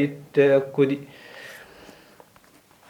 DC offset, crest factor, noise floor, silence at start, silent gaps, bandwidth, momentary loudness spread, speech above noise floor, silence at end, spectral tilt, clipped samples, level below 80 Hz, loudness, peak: under 0.1%; 20 dB; -55 dBFS; 0 s; none; 15 kHz; 23 LU; 34 dB; 1.35 s; -7.5 dB/octave; under 0.1%; -70 dBFS; -21 LUFS; -6 dBFS